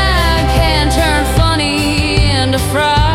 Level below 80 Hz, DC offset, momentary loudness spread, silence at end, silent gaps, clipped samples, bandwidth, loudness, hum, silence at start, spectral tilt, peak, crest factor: -18 dBFS; under 0.1%; 2 LU; 0 s; none; under 0.1%; 16 kHz; -12 LUFS; none; 0 s; -4.5 dB/octave; 0 dBFS; 10 dB